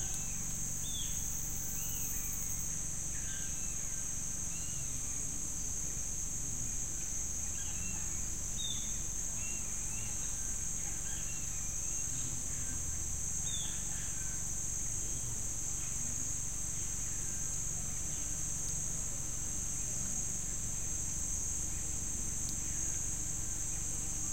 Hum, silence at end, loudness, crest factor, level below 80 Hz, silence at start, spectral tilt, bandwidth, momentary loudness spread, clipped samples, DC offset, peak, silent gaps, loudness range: none; 0 s; -36 LUFS; 16 dB; -46 dBFS; 0 s; -2 dB/octave; 16 kHz; 2 LU; under 0.1%; 0.8%; -20 dBFS; none; 1 LU